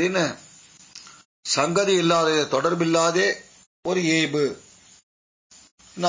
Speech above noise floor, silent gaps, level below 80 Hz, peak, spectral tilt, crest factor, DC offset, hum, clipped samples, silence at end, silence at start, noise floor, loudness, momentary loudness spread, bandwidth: 28 dB; 1.25-1.43 s, 3.67-3.83 s, 5.03-5.50 s, 5.71-5.78 s; -66 dBFS; -6 dBFS; -4 dB/octave; 18 dB; under 0.1%; none; under 0.1%; 0 s; 0 s; -49 dBFS; -21 LUFS; 23 LU; 7.8 kHz